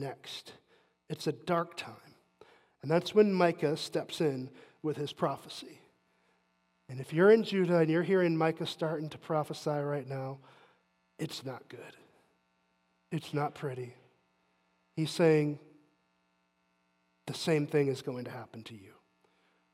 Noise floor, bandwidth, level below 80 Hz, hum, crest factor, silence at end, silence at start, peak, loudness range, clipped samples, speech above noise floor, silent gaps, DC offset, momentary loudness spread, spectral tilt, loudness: -75 dBFS; 15 kHz; -82 dBFS; none; 22 dB; 0.85 s; 0 s; -12 dBFS; 12 LU; under 0.1%; 44 dB; none; under 0.1%; 20 LU; -6.5 dB/octave; -31 LUFS